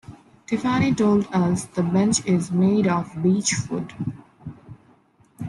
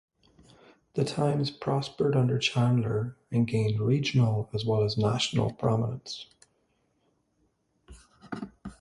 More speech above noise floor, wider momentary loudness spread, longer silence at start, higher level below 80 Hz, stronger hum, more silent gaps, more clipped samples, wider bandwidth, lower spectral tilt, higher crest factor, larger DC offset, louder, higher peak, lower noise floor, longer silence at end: second, 36 dB vs 46 dB; about the same, 13 LU vs 14 LU; second, 0.1 s vs 0.95 s; about the same, -56 dBFS vs -58 dBFS; neither; neither; neither; about the same, 11.5 kHz vs 11.5 kHz; about the same, -5.5 dB/octave vs -6.5 dB/octave; about the same, 16 dB vs 18 dB; neither; first, -22 LUFS vs -28 LUFS; about the same, -8 dBFS vs -10 dBFS; second, -57 dBFS vs -72 dBFS; about the same, 0 s vs 0.05 s